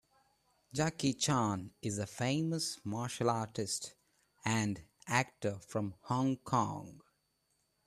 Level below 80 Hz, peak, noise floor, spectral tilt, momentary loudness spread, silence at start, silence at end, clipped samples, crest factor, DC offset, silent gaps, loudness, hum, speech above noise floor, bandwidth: -70 dBFS; -14 dBFS; -79 dBFS; -4.5 dB/octave; 7 LU; 0.75 s; 0.9 s; under 0.1%; 24 dB; under 0.1%; none; -36 LUFS; none; 43 dB; 14 kHz